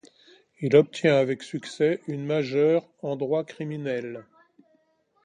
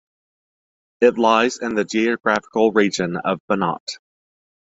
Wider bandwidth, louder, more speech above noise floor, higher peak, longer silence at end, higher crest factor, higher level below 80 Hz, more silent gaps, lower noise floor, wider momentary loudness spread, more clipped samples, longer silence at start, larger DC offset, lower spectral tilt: first, 10 kHz vs 8 kHz; second, -25 LUFS vs -19 LUFS; second, 43 dB vs over 71 dB; about the same, -4 dBFS vs -2 dBFS; first, 1.05 s vs 0.75 s; about the same, 22 dB vs 18 dB; second, -70 dBFS vs -60 dBFS; second, none vs 3.40-3.48 s, 3.80-3.87 s; second, -67 dBFS vs under -90 dBFS; first, 13 LU vs 8 LU; neither; second, 0.6 s vs 1 s; neither; first, -6.5 dB/octave vs -4.5 dB/octave